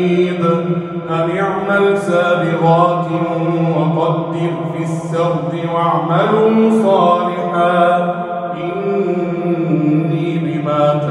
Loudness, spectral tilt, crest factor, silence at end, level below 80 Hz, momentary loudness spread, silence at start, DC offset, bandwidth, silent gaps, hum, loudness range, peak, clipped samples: -15 LUFS; -8 dB/octave; 14 dB; 0 s; -58 dBFS; 8 LU; 0 s; under 0.1%; 10.5 kHz; none; none; 3 LU; -2 dBFS; under 0.1%